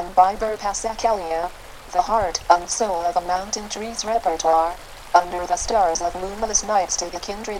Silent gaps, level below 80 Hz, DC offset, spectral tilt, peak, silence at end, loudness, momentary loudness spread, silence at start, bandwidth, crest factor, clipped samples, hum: none; -42 dBFS; under 0.1%; -2 dB/octave; 0 dBFS; 0 s; -22 LUFS; 8 LU; 0 s; 16 kHz; 20 dB; under 0.1%; none